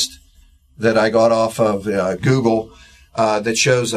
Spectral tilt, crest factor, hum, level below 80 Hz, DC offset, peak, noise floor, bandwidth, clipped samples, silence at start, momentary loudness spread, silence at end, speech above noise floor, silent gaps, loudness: -4.5 dB/octave; 16 dB; none; -48 dBFS; under 0.1%; -2 dBFS; -51 dBFS; 14 kHz; under 0.1%; 0 s; 8 LU; 0 s; 34 dB; none; -17 LUFS